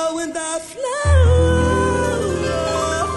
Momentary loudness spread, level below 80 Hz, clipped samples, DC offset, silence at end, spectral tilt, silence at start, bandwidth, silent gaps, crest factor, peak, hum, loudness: 10 LU; -24 dBFS; under 0.1%; under 0.1%; 0 s; -5.5 dB/octave; 0 s; 11.5 kHz; none; 14 dB; -4 dBFS; none; -18 LUFS